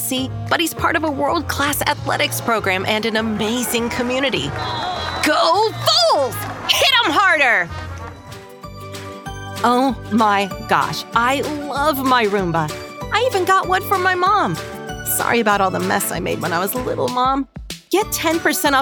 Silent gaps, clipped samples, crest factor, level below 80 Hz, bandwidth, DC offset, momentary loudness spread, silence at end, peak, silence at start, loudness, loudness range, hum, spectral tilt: none; under 0.1%; 18 dB; -42 dBFS; 19 kHz; under 0.1%; 15 LU; 0 s; -2 dBFS; 0 s; -17 LUFS; 4 LU; none; -3.5 dB/octave